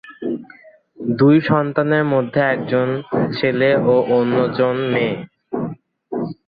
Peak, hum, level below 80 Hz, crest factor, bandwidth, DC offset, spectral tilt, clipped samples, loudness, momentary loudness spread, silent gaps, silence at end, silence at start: -2 dBFS; none; -58 dBFS; 16 dB; 5 kHz; under 0.1%; -10 dB/octave; under 0.1%; -18 LUFS; 13 LU; none; 0.15 s; 0.05 s